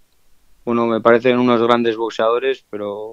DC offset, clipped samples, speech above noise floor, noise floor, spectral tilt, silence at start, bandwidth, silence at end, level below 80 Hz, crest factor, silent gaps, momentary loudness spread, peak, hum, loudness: under 0.1%; under 0.1%; 35 dB; -51 dBFS; -6.5 dB/octave; 0.65 s; 7.6 kHz; 0 s; -62 dBFS; 18 dB; none; 12 LU; 0 dBFS; none; -17 LUFS